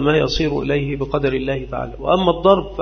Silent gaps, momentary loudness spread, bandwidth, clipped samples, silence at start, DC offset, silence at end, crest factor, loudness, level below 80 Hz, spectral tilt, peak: none; 9 LU; 6.6 kHz; under 0.1%; 0 s; under 0.1%; 0 s; 18 dB; -19 LUFS; -34 dBFS; -6.5 dB/octave; 0 dBFS